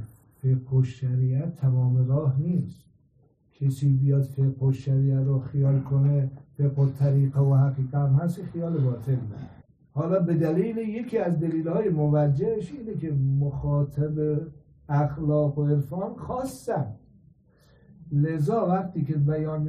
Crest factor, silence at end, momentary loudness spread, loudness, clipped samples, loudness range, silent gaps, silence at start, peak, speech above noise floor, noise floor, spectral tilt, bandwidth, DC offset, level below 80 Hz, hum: 14 dB; 0 s; 9 LU; -25 LUFS; under 0.1%; 5 LU; none; 0 s; -12 dBFS; 38 dB; -62 dBFS; -10 dB/octave; 9 kHz; under 0.1%; -54 dBFS; none